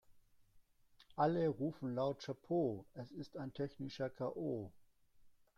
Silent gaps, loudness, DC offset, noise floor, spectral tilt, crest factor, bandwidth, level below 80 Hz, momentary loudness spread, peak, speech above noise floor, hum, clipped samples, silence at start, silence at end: none; -41 LUFS; under 0.1%; -69 dBFS; -8 dB/octave; 20 dB; 12.5 kHz; -74 dBFS; 13 LU; -22 dBFS; 29 dB; none; under 0.1%; 0.1 s; 0.25 s